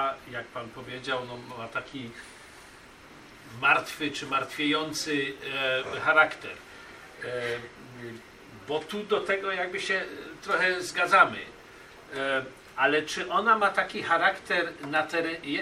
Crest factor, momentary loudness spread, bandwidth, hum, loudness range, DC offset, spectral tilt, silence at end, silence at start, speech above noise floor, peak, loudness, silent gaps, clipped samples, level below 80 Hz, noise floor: 24 dB; 22 LU; 15.5 kHz; none; 7 LU; under 0.1%; -3 dB/octave; 0 s; 0 s; 22 dB; -6 dBFS; -27 LUFS; none; under 0.1%; -64 dBFS; -50 dBFS